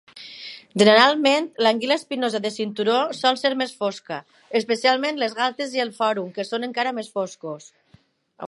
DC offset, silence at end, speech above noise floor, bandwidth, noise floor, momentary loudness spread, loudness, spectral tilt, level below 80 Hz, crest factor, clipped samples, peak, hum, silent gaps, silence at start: under 0.1%; 0 s; 36 dB; 11.5 kHz; -58 dBFS; 18 LU; -21 LUFS; -3.5 dB/octave; -74 dBFS; 22 dB; under 0.1%; 0 dBFS; none; none; 0.15 s